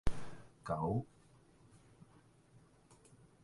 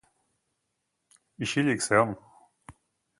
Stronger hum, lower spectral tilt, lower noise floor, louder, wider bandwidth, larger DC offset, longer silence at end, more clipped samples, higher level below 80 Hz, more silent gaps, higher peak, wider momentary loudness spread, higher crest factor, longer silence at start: neither; first, -7.5 dB/octave vs -4.5 dB/octave; second, -66 dBFS vs -80 dBFS; second, -42 LUFS vs -26 LUFS; about the same, 11.5 kHz vs 11.5 kHz; neither; first, 2.4 s vs 0.5 s; neither; first, -52 dBFS vs -64 dBFS; neither; second, -20 dBFS vs -6 dBFS; first, 27 LU vs 12 LU; about the same, 22 dB vs 24 dB; second, 0.05 s vs 1.4 s